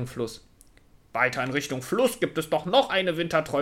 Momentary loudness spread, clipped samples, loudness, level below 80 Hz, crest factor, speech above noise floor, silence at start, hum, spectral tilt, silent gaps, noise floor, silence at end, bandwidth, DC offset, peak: 12 LU; under 0.1%; -26 LUFS; -58 dBFS; 18 dB; 30 dB; 0 s; none; -4.5 dB/octave; none; -56 dBFS; 0 s; 16.5 kHz; under 0.1%; -8 dBFS